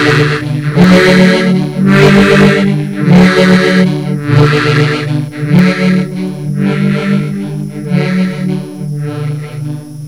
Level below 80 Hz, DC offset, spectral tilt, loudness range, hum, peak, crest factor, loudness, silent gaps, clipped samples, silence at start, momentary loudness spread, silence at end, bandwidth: -38 dBFS; 0.6%; -7 dB/octave; 8 LU; none; 0 dBFS; 10 dB; -10 LUFS; none; 2%; 0 s; 13 LU; 0 s; 13.5 kHz